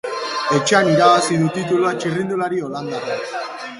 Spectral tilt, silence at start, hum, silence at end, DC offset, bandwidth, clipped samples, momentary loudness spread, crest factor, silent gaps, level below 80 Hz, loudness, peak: -4.5 dB/octave; 0.05 s; none; 0 s; under 0.1%; 11.5 kHz; under 0.1%; 12 LU; 18 dB; none; -60 dBFS; -18 LUFS; 0 dBFS